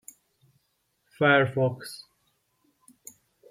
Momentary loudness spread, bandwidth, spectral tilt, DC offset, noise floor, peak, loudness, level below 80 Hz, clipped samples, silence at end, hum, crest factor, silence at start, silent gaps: 28 LU; 16 kHz; -5.5 dB/octave; under 0.1%; -74 dBFS; -8 dBFS; -23 LUFS; -72 dBFS; under 0.1%; 1.55 s; none; 22 dB; 1.2 s; none